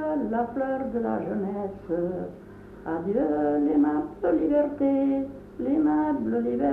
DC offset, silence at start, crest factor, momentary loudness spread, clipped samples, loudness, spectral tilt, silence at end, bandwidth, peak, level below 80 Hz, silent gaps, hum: under 0.1%; 0 s; 14 dB; 10 LU; under 0.1%; -26 LUFS; -10 dB/octave; 0 s; 3.5 kHz; -12 dBFS; -54 dBFS; none; none